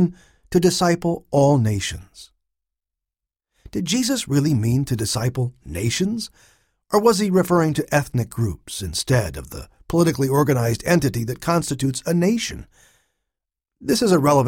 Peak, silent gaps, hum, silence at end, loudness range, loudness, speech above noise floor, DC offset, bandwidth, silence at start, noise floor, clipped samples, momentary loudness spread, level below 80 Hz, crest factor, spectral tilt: -4 dBFS; none; none; 0 s; 3 LU; -20 LUFS; 67 dB; under 0.1%; 17.5 kHz; 0 s; -87 dBFS; under 0.1%; 11 LU; -44 dBFS; 18 dB; -5.5 dB/octave